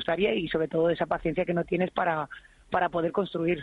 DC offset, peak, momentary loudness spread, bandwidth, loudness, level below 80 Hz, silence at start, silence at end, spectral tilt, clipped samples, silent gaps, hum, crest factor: under 0.1%; -12 dBFS; 5 LU; 5.6 kHz; -28 LUFS; -54 dBFS; 0 s; 0 s; -8 dB/octave; under 0.1%; none; none; 16 dB